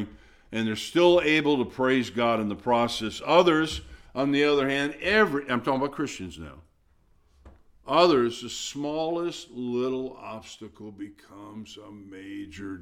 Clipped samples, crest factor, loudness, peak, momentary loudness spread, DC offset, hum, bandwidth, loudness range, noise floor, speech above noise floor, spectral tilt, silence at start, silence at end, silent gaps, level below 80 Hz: under 0.1%; 22 dB; -25 LUFS; -4 dBFS; 22 LU; under 0.1%; none; 14.5 kHz; 10 LU; -63 dBFS; 37 dB; -4.5 dB/octave; 0 s; 0 s; none; -54 dBFS